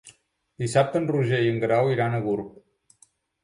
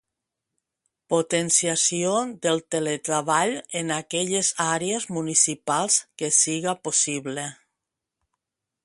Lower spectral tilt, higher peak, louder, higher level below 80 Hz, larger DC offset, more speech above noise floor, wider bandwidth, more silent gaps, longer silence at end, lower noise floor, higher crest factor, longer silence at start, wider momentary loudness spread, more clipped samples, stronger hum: first, -6.5 dB/octave vs -2.5 dB/octave; second, -8 dBFS vs -4 dBFS; about the same, -24 LUFS vs -23 LUFS; first, -60 dBFS vs -70 dBFS; neither; second, 39 dB vs 60 dB; about the same, 11.5 kHz vs 11.5 kHz; neither; second, 0.95 s vs 1.3 s; second, -62 dBFS vs -84 dBFS; about the same, 18 dB vs 22 dB; second, 0.05 s vs 1.1 s; about the same, 9 LU vs 8 LU; neither; neither